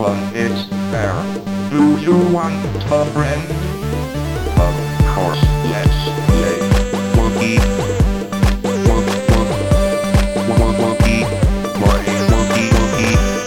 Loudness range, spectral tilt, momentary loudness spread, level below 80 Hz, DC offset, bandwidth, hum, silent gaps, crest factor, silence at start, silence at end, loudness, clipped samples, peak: 2 LU; -6 dB/octave; 6 LU; -22 dBFS; 0.3%; 18.5 kHz; none; none; 14 dB; 0 s; 0 s; -16 LUFS; under 0.1%; -2 dBFS